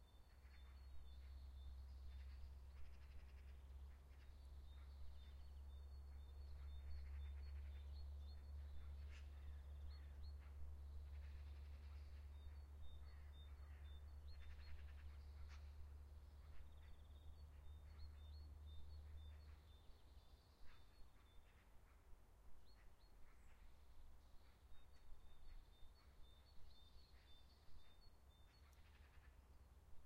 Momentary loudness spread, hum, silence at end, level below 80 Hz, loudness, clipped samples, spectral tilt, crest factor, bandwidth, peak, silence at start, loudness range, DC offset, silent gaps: 12 LU; none; 0 s; -60 dBFS; -61 LUFS; under 0.1%; -6 dB/octave; 14 dB; 15 kHz; -44 dBFS; 0 s; 5 LU; under 0.1%; none